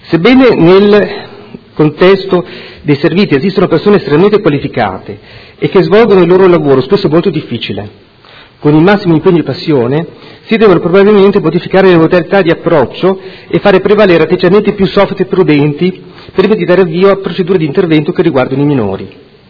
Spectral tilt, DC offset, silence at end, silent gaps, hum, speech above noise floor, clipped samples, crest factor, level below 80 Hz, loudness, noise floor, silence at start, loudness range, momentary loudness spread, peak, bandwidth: -9 dB/octave; under 0.1%; 0.4 s; none; none; 29 dB; 3%; 8 dB; -40 dBFS; -8 LUFS; -37 dBFS; 0.05 s; 2 LU; 12 LU; 0 dBFS; 5.4 kHz